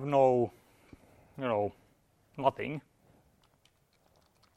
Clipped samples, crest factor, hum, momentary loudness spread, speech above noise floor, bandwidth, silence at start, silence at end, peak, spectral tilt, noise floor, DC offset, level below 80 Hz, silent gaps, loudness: under 0.1%; 22 dB; none; 19 LU; 40 dB; 9.6 kHz; 0 s; 1.75 s; -12 dBFS; -8 dB/octave; -69 dBFS; under 0.1%; -70 dBFS; none; -32 LUFS